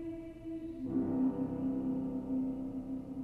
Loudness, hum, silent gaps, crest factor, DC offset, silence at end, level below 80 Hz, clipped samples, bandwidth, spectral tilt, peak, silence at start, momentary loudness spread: -37 LUFS; none; none; 12 dB; under 0.1%; 0 s; -58 dBFS; under 0.1%; 3.1 kHz; -10 dB/octave; -24 dBFS; 0 s; 10 LU